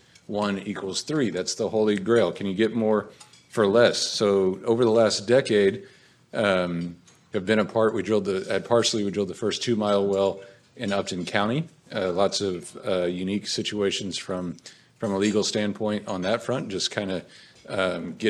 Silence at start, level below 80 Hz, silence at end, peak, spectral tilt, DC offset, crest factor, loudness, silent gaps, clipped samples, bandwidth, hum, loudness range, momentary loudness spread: 0.3 s; -68 dBFS; 0 s; -4 dBFS; -4.5 dB/octave; under 0.1%; 20 dB; -25 LUFS; none; under 0.1%; 12.5 kHz; none; 5 LU; 11 LU